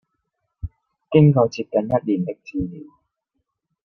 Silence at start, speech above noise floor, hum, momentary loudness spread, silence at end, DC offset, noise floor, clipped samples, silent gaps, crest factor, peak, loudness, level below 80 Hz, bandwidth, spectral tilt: 0.65 s; 58 dB; none; 22 LU; 1 s; under 0.1%; -76 dBFS; under 0.1%; none; 20 dB; -2 dBFS; -20 LUFS; -46 dBFS; 6.4 kHz; -9 dB/octave